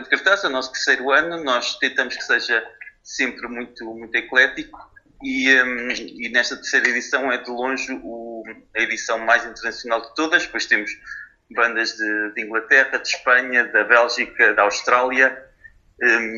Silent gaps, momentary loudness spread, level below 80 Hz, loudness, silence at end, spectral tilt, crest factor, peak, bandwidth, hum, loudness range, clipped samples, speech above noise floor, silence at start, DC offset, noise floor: none; 16 LU; -60 dBFS; -19 LUFS; 0 s; -1 dB/octave; 20 dB; 0 dBFS; 7.6 kHz; none; 5 LU; under 0.1%; 30 dB; 0 s; under 0.1%; -50 dBFS